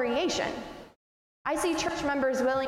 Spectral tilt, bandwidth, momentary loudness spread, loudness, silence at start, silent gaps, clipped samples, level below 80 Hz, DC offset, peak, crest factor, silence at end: -3 dB/octave; 16 kHz; 14 LU; -29 LUFS; 0 s; 0.96-1.45 s; under 0.1%; -56 dBFS; under 0.1%; -16 dBFS; 14 dB; 0 s